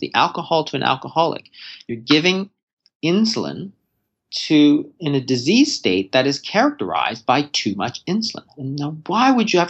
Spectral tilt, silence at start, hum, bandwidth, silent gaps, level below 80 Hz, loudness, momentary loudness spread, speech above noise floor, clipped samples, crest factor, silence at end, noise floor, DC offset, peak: -4.5 dB/octave; 0 s; none; 8.2 kHz; 2.63-2.67 s, 2.73-2.77 s, 2.95-3.00 s; -68 dBFS; -19 LUFS; 14 LU; 54 dB; under 0.1%; 18 dB; 0 s; -73 dBFS; under 0.1%; -2 dBFS